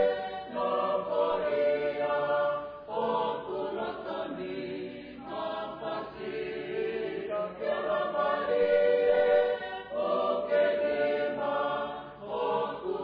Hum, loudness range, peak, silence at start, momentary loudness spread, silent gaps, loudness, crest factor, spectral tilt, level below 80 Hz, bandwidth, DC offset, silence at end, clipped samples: none; 9 LU; -16 dBFS; 0 s; 12 LU; none; -30 LUFS; 14 dB; -7.5 dB/octave; -64 dBFS; 5.2 kHz; under 0.1%; 0 s; under 0.1%